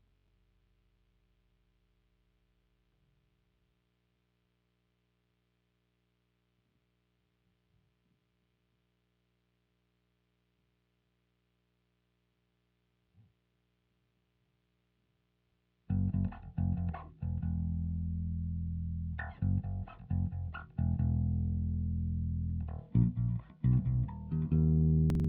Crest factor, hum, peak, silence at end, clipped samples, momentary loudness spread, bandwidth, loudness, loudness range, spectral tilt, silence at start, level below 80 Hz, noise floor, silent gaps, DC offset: 20 dB; 60 Hz at -65 dBFS; -16 dBFS; 0 s; under 0.1%; 9 LU; 3.4 kHz; -34 LUFS; 6 LU; -11 dB/octave; 15.9 s; -48 dBFS; -78 dBFS; none; under 0.1%